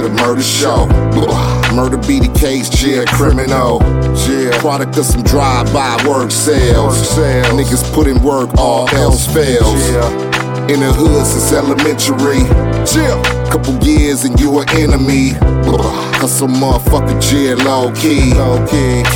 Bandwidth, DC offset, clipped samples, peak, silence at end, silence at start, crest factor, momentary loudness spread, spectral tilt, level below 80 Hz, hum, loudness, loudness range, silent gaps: 18 kHz; under 0.1%; under 0.1%; 0 dBFS; 0 s; 0 s; 10 dB; 3 LU; -5 dB/octave; -18 dBFS; none; -11 LUFS; 1 LU; none